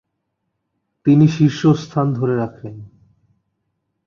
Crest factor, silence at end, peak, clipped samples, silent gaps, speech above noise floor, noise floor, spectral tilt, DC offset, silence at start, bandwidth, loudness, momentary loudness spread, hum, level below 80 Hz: 16 dB; 1.2 s; -2 dBFS; under 0.1%; none; 59 dB; -74 dBFS; -8 dB/octave; under 0.1%; 1.05 s; 7.2 kHz; -17 LUFS; 15 LU; none; -56 dBFS